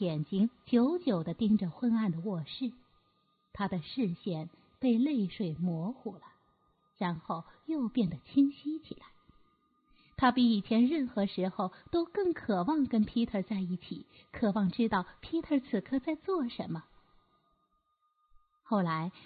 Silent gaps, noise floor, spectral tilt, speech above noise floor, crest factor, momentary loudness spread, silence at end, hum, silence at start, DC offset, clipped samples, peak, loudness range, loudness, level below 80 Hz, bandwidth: none; -76 dBFS; -10.5 dB/octave; 45 dB; 18 dB; 12 LU; 0.15 s; none; 0 s; under 0.1%; under 0.1%; -14 dBFS; 5 LU; -32 LUFS; -64 dBFS; 4.8 kHz